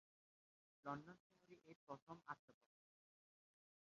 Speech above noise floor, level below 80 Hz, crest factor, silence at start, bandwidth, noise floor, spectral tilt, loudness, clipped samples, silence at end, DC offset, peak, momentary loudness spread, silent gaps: over 33 dB; under -90 dBFS; 26 dB; 0.85 s; 7 kHz; under -90 dBFS; -5.5 dB/octave; -57 LUFS; under 0.1%; 1.4 s; under 0.1%; -36 dBFS; 14 LU; 1.20-1.30 s, 1.76-1.87 s, 2.02-2.07 s, 2.39-2.48 s